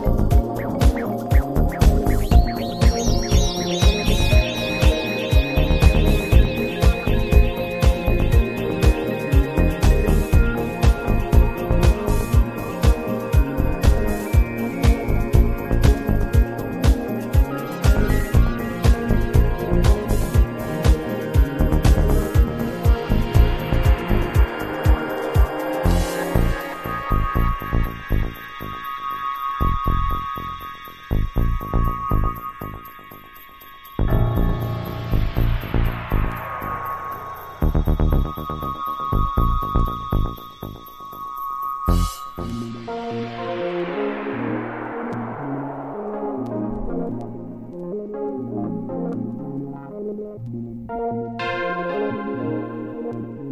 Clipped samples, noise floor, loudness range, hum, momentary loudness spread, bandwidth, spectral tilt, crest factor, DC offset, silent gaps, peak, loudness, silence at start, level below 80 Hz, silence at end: under 0.1%; -42 dBFS; 8 LU; none; 12 LU; 15 kHz; -6.5 dB/octave; 20 dB; under 0.1%; none; 0 dBFS; -22 LUFS; 0 s; -22 dBFS; 0 s